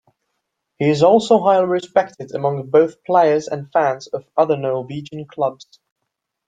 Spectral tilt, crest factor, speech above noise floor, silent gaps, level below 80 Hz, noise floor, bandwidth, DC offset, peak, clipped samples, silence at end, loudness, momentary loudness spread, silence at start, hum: -6.5 dB/octave; 16 dB; 60 dB; none; -64 dBFS; -78 dBFS; 9.2 kHz; under 0.1%; -2 dBFS; under 0.1%; 0.95 s; -18 LUFS; 12 LU; 0.8 s; none